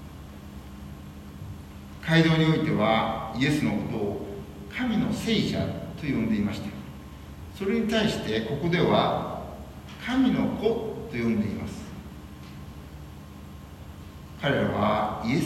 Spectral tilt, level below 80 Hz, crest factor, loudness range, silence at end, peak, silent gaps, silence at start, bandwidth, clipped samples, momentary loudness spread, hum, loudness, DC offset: -6.5 dB/octave; -48 dBFS; 20 dB; 7 LU; 0 s; -8 dBFS; none; 0 s; 14 kHz; under 0.1%; 20 LU; none; -26 LUFS; under 0.1%